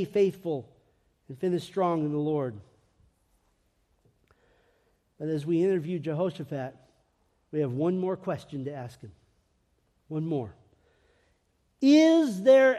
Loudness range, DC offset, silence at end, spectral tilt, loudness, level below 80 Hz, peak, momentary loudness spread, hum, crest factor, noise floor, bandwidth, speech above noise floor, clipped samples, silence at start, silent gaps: 10 LU; under 0.1%; 0 s; -7 dB/octave; -27 LUFS; -70 dBFS; -10 dBFS; 18 LU; none; 18 dB; -71 dBFS; 12.5 kHz; 45 dB; under 0.1%; 0 s; none